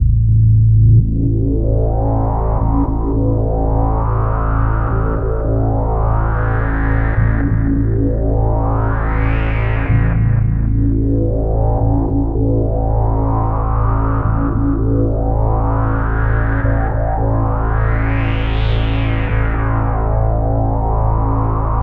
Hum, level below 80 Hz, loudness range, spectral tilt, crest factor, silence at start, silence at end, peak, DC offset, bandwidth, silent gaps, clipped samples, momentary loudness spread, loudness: none; -18 dBFS; 1 LU; -11.5 dB/octave; 12 dB; 0 s; 0 s; -2 dBFS; under 0.1%; 4 kHz; none; under 0.1%; 3 LU; -16 LUFS